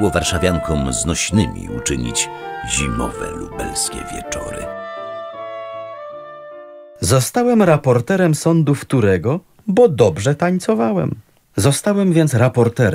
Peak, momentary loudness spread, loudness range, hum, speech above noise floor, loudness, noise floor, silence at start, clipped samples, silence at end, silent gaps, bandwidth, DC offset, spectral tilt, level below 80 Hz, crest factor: 0 dBFS; 15 LU; 11 LU; none; 21 dB; -17 LUFS; -37 dBFS; 0 s; under 0.1%; 0 s; none; 16 kHz; under 0.1%; -5 dB/octave; -36 dBFS; 16 dB